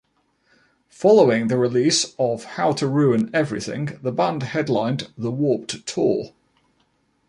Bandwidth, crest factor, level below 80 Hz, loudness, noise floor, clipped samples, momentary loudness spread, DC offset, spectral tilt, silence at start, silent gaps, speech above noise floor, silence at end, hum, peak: 11.5 kHz; 18 dB; -62 dBFS; -21 LUFS; -66 dBFS; under 0.1%; 11 LU; under 0.1%; -5 dB/octave; 1 s; none; 45 dB; 1 s; none; -2 dBFS